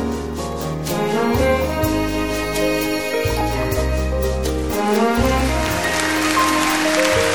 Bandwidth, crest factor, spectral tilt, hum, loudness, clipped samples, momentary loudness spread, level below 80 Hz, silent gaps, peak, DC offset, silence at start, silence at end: over 20 kHz; 18 dB; -4.5 dB/octave; none; -19 LUFS; under 0.1%; 6 LU; -28 dBFS; none; 0 dBFS; 0.9%; 0 s; 0 s